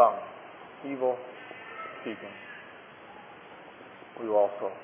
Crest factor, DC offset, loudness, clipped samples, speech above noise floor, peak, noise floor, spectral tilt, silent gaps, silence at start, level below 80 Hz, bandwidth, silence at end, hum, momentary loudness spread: 26 dB; under 0.1%; -32 LUFS; under 0.1%; 18 dB; -6 dBFS; -49 dBFS; -3 dB/octave; none; 0 s; -80 dBFS; 3.6 kHz; 0 s; none; 21 LU